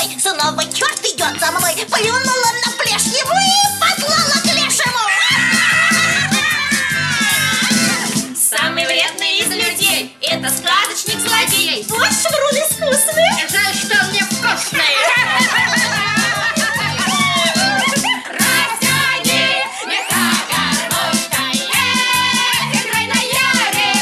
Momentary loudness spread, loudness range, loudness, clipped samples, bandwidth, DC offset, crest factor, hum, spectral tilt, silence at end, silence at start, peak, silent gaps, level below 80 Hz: 4 LU; 2 LU; -13 LUFS; under 0.1%; 16 kHz; under 0.1%; 14 dB; none; -1.5 dB/octave; 0 s; 0 s; 0 dBFS; none; -56 dBFS